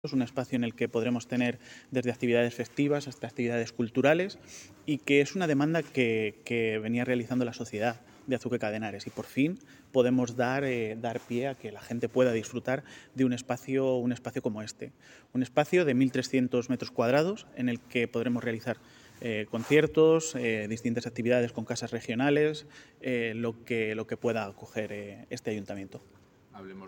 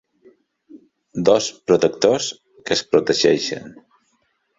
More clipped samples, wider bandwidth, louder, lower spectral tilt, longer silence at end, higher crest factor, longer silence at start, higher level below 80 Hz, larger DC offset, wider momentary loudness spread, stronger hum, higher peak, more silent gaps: neither; first, 17 kHz vs 8 kHz; second, -30 LUFS vs -18 LUFS; first, -6 dB/octave vs -4 dB/octave; second, 0 s vs 0.85 s; about the same, 22 dB vs 20 dB; second, 0.05 s vs 0.75 s; second, -70 dBFS vs -58 dBFS; neither; about the same, 13 LU vs 13 LU; neither; second, -8 dBFS vs -2 dBFS; neither